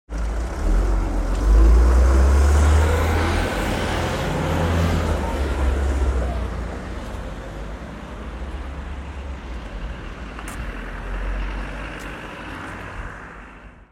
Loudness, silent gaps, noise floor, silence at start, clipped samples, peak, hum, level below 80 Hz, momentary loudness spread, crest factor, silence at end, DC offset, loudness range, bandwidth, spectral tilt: -23 LUFS; none; -42 dBFS; 0.1 s; under 0.1%; -6 dBFS; none; -22 dBFS; 17 LU; 16 dB; 0.1 s; under 0.1%; 15 LU; 14 kHz; -6 dB/octave